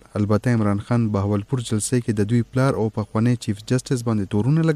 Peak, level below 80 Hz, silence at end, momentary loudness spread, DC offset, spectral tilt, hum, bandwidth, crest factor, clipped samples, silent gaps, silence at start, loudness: -8 dBFS; -50 dBFS; 0 s; 4 LU; under 0.1%; -7 dB/octave; none; 13.5 kHz; 14 dB; under 0.1%; none; 0.15 s; -22 LUFS